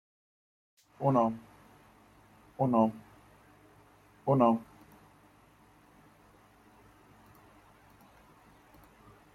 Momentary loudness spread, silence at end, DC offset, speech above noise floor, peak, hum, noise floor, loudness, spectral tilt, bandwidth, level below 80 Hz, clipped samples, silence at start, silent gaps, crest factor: 24 LU; 4.7 s; under 0.1%; 34 dB; -12 dBFS; none; -61 dBFS; -29 LUFS; -9.5 dB/octave; 13.5 kHz; -70 dBFS; under 0.1%; 1 s; none; 22 dB